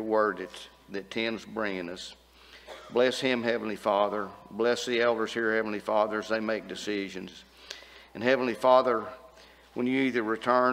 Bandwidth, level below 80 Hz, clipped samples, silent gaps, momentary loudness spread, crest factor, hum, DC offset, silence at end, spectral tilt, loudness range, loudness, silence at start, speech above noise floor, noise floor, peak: 16 kHz; -66 dBFS; under 0.1%; none; 18 LU; 22 dB; none; under 0.1%; 0 s; -4.5 dB/octave; 3 LU; -28 LUFS; 0 s; 26 dB; -54 dBFS; -8 dBFS